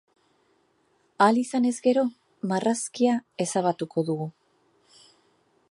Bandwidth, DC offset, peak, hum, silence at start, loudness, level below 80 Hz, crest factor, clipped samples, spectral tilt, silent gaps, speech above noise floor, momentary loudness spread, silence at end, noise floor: 11.5 kHz; under 0.1%; -6 dBFS; none; 1.2 s; -25 LUFS; -78 dBFS; 20 dB; under 0.1%; -5 dB/octave; none; 43 dB; 9 LU; 1.4 s; -67 dBFS